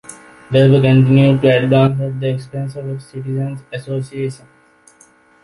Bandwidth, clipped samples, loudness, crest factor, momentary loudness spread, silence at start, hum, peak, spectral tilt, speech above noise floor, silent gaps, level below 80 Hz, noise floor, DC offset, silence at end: 11.5 kHz; under 0.1%; -15 LUFS; 14 dB; 16 LU; 0.1 s; none; -2 dBFS; -8 dB/octave; 35 dB; none; -50 dBFS; -50 dBFS; under 0.1%; 1.05 s